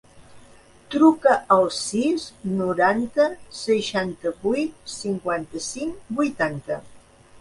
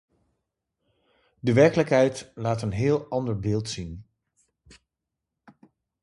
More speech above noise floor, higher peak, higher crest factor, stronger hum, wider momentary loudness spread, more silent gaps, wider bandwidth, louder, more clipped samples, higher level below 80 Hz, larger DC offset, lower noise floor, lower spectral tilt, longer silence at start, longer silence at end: second, 28 dB vs 62 dB; about the same, -4 dBFS vs -6 dBFS; about the same, 20 dB vs 22 dB; neither; about the same, 13 LU vs 15 LU; neither; about the same, 11.5 kHz vs 11.5 kHz; about the same, -23 LUFS vs -24 LUFS; neither; second, -58 dBFS vs -52 dBFS; neither; second, -50 dBFS vs -85 dBFS; second, -4.5 dB/octave vs -6.5 dB/octave; second, 0.15 s vs 1.45 s; second, 0 s vs 2 s